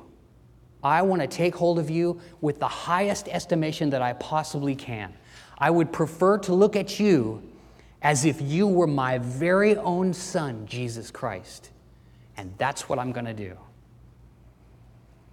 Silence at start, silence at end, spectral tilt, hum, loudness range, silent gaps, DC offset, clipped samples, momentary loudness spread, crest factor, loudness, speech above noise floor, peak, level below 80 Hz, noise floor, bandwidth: 0.85 s; 1.75 s; -5.5 dB/octave; none; 10 LU; none; under 0.1%; under 0.1%; 14 LU; 20 dB; -25 LUFS; 29 dB; -6 dBFS; -58 dBFS; -54 dBFS; 15.5 kHz